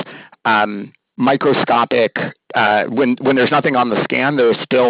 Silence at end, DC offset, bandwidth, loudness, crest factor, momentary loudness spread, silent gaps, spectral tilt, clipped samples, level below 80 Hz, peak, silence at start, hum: 0 s; under 0.1%; 5.2 kHz; -15 LUFS; 12 dB; 8 LU; none; -10 dB/octave; under 0.1%; -60 dBFS; -2 dBFS; 0 s; none